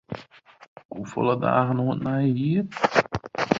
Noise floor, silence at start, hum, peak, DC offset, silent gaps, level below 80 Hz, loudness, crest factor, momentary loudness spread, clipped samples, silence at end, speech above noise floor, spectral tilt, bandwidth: -50 dBFS; 0.1 s; none; -2 dBFS; under 0.1%; 0.68-0.76 s, 0.85-0.89 s; -56 dBFS; -24 LUFS; 24 dB; 16 LU; under 0.1%; 0 s; 27 dB; -7 dB/octave; 7.6 kHz